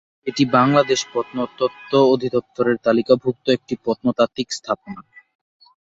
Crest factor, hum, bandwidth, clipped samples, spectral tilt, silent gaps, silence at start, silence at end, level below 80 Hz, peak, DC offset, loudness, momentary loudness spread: 18 dB; none; 8 kHz; under 0.1%; -5 dB/octave; none; 0.25 s; 0.85 s; -60 dBFS; -2 dBFS; under 0.1%; -19 LUFS; 11 LU